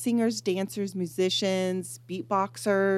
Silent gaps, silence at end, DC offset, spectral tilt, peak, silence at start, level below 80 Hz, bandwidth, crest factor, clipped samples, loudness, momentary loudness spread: none; 0 s; under 0.1%; -4.5 dB/octave; -12 dBFS; 0 s; -78 dBFS; 15 kHz; 14 dB; under 0.1%; -28 LUFS; 7 LU